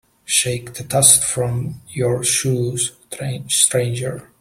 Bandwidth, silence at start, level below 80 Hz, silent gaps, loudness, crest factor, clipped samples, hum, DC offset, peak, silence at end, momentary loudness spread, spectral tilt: 16.5 kHz; 0.3 s; -50 dBFS; none; -17 LUFS; 20 dB; under 0.1%; none; under 0.1%; 0 dBFS; 0.15 s; 16 LU; -3 dB/octave